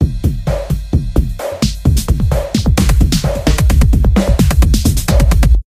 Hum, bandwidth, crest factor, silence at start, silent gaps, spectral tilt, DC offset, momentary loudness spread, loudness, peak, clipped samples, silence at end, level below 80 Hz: none; 15.5 kHz; 12 dB; 0 s; none; -6 dB/octave; under 0.1%; 6 LU; -14 LUFS; 0 dBFS; under 0.1%; 0.05 s; -14 dBFS